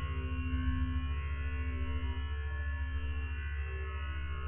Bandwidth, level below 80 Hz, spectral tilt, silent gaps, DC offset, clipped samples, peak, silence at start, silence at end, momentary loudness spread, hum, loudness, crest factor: 3.5 kHz; -36 dBFS; -5.5 dB/octave; none; 0.4%; under 0.1%; -24 dBFS; 0 s; 0 s; 4 LU; none; -38 LUFS; 12 dB